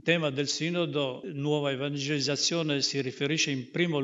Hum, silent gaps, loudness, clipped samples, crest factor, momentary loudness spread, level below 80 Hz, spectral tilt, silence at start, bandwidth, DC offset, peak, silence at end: none; none; -29 LUFS; under 0.1%; 20 dB; 4 LU; -76 dBFS; -4 dB/octave; 0.05 s; 8 kHz; under 0.1%; -8 dBFS; 0 s